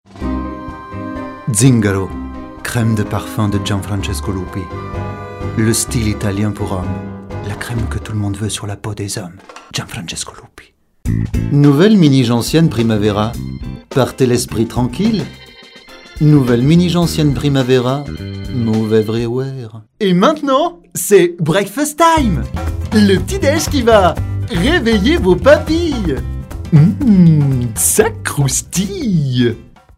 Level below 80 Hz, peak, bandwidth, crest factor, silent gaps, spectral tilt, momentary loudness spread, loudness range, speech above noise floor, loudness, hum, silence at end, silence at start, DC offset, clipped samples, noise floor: -30 dBFS; 0 dBFS; 16 kHz; 14 dB; none; -5.5 dB/octave; 15 LU; 8 LU; 31 dB; -14 LUFS; none; 0.35 s; 0.15 s; under 0.1%; under 0.1%; -44 dBFS